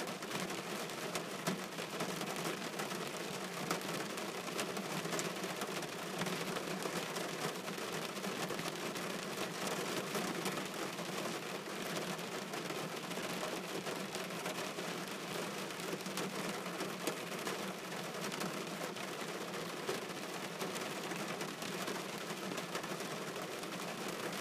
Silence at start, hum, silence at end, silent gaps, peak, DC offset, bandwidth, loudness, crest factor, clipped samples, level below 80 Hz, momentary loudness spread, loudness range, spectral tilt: 0 s; none; 0 s; none; -18 dBFS; under 0.1%; 15.5 kHz; -40 LUFS; 24 dB; under 0.1%; -82 dBFS; 3 LU; 2 LU; -3 dB/octave